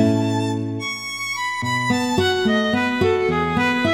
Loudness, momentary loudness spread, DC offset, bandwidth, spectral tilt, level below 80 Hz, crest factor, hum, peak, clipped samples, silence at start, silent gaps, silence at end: -20 LUFS; 6 LU; 0.1%; 16 kHz; -5 dB/octave; -48 dBFS; 16 dB; none; -4 dBFS; under 0.1%; 0 s; none; 0 s